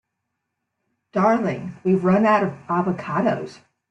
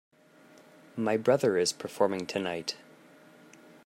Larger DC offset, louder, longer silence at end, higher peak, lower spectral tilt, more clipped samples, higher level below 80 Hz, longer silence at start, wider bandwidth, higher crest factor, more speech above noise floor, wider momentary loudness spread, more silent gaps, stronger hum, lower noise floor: neither; first, -21 LUFS vs -29 LUFS; second, 0.35 s vs 1.1 s; first, -6 dBFS vs -10 dBFS; first, -8.5 dB/octave vs -4 dB/octave; neither; first, -62 dBFS vs -78 dBFS; first, 1.15 s vs 0.95 s; second, 8 kHz vs 16 kHz; about the same, 16 dB vs 20 dB; first, 58 dB vs 29 dB; about the same, 10 LU vs 12 LU; neither; neither; first, -79 dBFS vs -57 dBFS